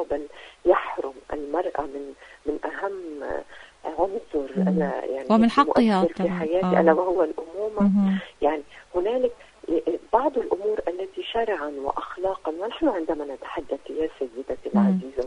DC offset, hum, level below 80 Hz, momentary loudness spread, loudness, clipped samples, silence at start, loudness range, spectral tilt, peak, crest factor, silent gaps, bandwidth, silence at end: under 0.1%; none; -52 dBFS; 13 LU; -25 LUFS; under 0.1%; 0 s; 7 LU; -7.5 dB/octave; -4 dBFS; 20 dB; none; 10.5 kHz; 0 s